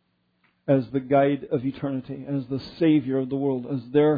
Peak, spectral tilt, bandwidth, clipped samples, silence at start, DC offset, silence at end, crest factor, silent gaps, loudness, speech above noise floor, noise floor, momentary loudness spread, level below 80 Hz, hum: -8 dBFS; -10.5 dB/octave; 5 kHz; under 0.1%; 0.7 s; under 0.1%; 0 s; 16 dB; none; -25 LUFS; 44 dB; -68 dBFS; 9 LU; -62 dBFS; none